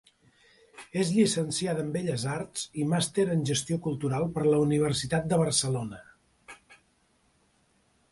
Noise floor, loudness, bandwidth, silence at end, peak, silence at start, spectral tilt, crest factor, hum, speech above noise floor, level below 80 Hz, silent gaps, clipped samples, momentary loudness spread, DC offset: -68 dBFS; -28 LUFS; 11.5 kHz; 1.35 s; -12 dBFS; 0.75 s; -5 dB/octave; 18 dB; none; 41 dB; -60 dBFS; none; under 0.1%; 9 LU; under 0.1%